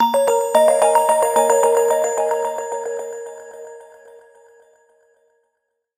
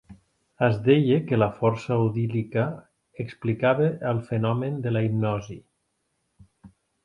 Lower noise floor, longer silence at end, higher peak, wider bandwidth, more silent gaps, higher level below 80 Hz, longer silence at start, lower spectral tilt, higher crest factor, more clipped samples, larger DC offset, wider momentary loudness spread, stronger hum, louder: about the same, -74 dBFS vs -75 dBFS; first, 2.15 s vs 0.35 s; first, -2 dBFS vs -6 dBFS; first, 16 kHz vs 7.2 kHz; neither; second, -70 dBFS vs -58 dBFS; about the same, 0 s vs 0.1 s; second, -1 dB/octave vs -8.5 dB/octave; about the same, 18 dB vs 18 dB; neither; neither; first, 21 LU vs 12 LU; neither; first, -17 LUFS vs -24 LUFS